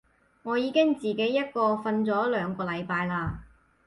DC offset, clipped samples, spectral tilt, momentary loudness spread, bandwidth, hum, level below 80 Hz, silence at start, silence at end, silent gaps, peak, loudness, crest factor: under 0.1%; under 0.1%; -7 dB/octave; 8 LU; 11.5 kHz; none; -54 dBFS; 0.45 s; 0.4 s; none; -12 dBFS; -27 LUFS; 16 dB